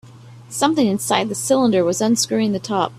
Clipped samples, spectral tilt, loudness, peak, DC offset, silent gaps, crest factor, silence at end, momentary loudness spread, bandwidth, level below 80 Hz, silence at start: under 0.1%; -4 dB/octave; -18 LUFS; -2 dBFS; under 0.1%; none; 18 dB; 0 s; 4 LU; 15 kHz; -58 dBFS; 0.05 s